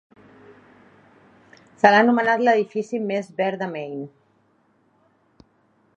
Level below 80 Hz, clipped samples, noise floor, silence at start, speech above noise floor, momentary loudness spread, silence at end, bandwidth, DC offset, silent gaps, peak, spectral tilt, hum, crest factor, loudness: -74 dBFS; under 0.1%; -63 dBFS; 1.85 s; 43 dB; 17 LU; 1.9 s; 8.4 kHz; under 0.1%; none; 0 dBFS; -6 dB/octave; none; 24 dB; -20 LUFS